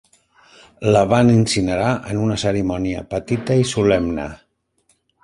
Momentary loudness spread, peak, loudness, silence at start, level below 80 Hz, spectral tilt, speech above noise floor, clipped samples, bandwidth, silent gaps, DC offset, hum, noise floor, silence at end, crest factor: 10 LU; -2 dBFS; -18 LUFS; 0.8 s; -42 dBFS; -6 dB/octave; 46 dB; under 0.1%; 11.5 kHz; none; under 0.1%; none; -64 dBFS; 0.9 s; 18 dB